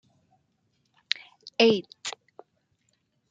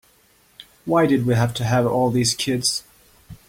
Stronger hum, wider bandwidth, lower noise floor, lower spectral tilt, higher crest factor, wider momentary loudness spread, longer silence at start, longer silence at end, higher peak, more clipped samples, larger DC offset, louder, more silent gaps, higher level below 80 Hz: neither; second, 9.4 kHz vs 16.5 kHz; first, -73 dBFS vs -57 dBFS; second, -3.5 dB/octave vs -5 dB/octave; first, 28 dB vs 16 dB; first, 16 LU vs 4 LU; first, 1.45 s vs 0.6 s; first, 1.2 s vs 0.15 s; first, -2 dBFS vs -6 dBFS; neither; neither; second, -27 LUFS vs -20 LUFS; neither; second, -78 dBFS vs -52 dBFS